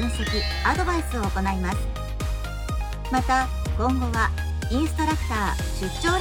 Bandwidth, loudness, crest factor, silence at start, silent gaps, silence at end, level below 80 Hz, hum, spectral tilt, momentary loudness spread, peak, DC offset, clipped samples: 17 kHz; -25 LUFS; 18 dB; 0 s; none; 0 s; -28 dBFS; none; -5 dB/octave; 7 LU; -6 dBFS; under 0.1%; under 0.1%